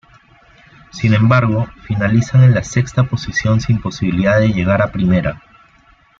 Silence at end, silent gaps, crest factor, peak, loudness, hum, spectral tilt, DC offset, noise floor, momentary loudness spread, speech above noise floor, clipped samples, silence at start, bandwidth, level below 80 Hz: 0.8 s; none; 14 dB; -2 dBFS; -15 LUFS; none; -7 dB/octave; under 0.1%; -50 dBFS; 9 LU; 37 dB; under 0.1%; 0.95 s; 7.6 kHz; -38 dBFS